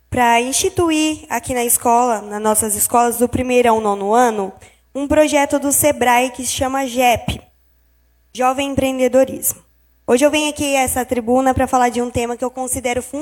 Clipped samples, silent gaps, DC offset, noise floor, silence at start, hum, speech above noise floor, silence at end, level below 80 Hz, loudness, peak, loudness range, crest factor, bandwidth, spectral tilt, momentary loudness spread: under 0.1%; none; under 0.1%; -56 dBFS; 0.1 s; none; 40 dB; 0 s; -42 dBFS; -16 LUFS; 0 dBFS; 3 LU; 16 dB; 17.5 kHz; -3 dB/octave; 8 LU